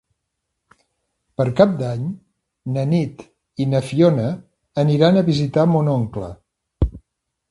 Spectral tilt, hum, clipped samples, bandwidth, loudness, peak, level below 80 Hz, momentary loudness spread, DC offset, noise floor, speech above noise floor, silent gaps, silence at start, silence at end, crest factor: -8 dB/octave; none; under 0.1%; 11.5 kHz; -19 LUFS; 0 dBFS; -38 dBFS; 17 LU; under 0.1%; -77 dBFS; 60 dB; none; 1.4 s; 0.5 s; 20 dB